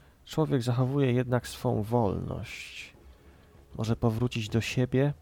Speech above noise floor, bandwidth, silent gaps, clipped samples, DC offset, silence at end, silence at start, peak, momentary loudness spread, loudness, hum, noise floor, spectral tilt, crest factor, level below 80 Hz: 27 dB; 17 kHz; none; under 0.1%; under 0.1%; 0.1 s; 0.25 s; -12 dBFS; 13 LU; -29 LUFS; none; -55 dBFS; -7 dB/octave; 18 dB; -52 dBFS